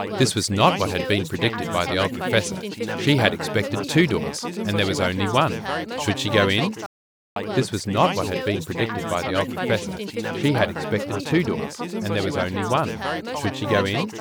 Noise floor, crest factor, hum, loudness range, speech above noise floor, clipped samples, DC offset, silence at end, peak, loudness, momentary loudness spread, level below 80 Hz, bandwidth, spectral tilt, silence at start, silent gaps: under -90 dBFS; 22 dB; none; 2 LU; over 67 dB; under 0.1%; under 0.1%; 0 s; 0 dBFS; -23 LUFS; 9 LU; -54 dBFS; over 20 kHz; -5 dB/octave; 0 s; 6.86-7.36 s